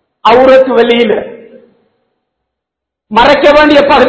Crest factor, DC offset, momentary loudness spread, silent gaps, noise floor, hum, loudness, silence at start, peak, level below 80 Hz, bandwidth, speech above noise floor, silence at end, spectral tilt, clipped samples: 8 dB; under 0.1%; 9 LU; none; -78 dBFS; none; -6 LUFS; 0.25 s; 0 dBFS; -38 dBFS; 8 kHz; 73 dB; 0 s; -5 dB/octave; 4%